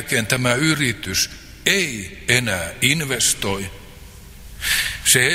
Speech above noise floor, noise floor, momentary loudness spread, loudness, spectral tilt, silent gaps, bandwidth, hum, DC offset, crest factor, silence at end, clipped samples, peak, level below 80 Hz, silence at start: 20 dB; -40 dBFS; 7 LU; -19 LUFS; -2.5 dB/octave; none; 16 kHz; none; under 0.1%; 20 dB; 0 s; under 0.1%; 0 dBFS; -42 dBFS; 0 s